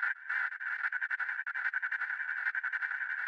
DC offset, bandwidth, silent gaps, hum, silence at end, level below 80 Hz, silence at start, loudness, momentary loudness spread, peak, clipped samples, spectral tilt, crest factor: under 0.1%; 8.4 kHz; none; none; 0 s; under -90 dBFS; 0 s; -34 LUFS; 2 LU; -20 dBFS; under 0.1%; 3 dB/octave; 16 dB